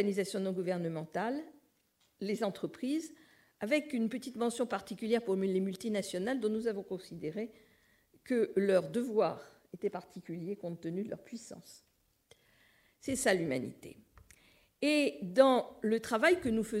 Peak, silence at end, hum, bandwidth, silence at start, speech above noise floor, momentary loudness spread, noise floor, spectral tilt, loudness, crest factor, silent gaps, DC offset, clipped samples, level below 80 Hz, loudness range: -12 dBFS; 0 s; none; 16 kHz; 0 s; 41 dB; 16 LU; -74 dBFS; -5 dB/octave; -34 LUFS; 24 dB; none; under 0.1%; under 0.1%; -70 dBFS; 7 LU